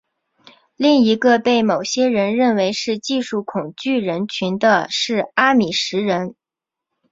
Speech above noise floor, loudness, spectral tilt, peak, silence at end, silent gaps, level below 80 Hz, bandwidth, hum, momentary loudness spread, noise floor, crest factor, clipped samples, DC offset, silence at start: 69 dB; -18 LUFS; -4.5 dB/octave; 0 dBFS; 0.8 s; none; -62 dBFS; 7.8 kHz; none; 8 LU; -86 dBFS; 18 dB; under 0.1%; under 0.1%; 0.8 s